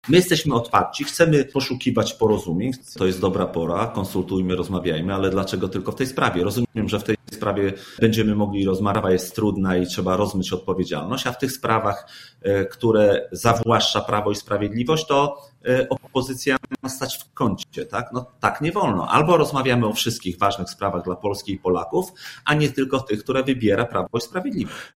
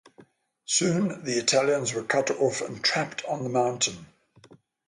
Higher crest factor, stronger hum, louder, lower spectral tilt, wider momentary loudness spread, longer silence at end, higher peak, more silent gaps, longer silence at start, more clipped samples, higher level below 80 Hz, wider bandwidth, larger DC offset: about the same, 20 dB vs 18 dB; neither; first, -22 LUFS vs -25 LUFS; first, -5.5 dB/octave vs -3 dB/octave; about the same, 8 LU vs 7 LU; second, 0.1 s vs 0.8 s; first, -2 dBFS vs -10 dBFS; neither; second, 0.05 s vs 0.2 s; neither; first, -48 dBFS vs -68 dBFS; first, 16 kHz vs 11.5 kHz; neither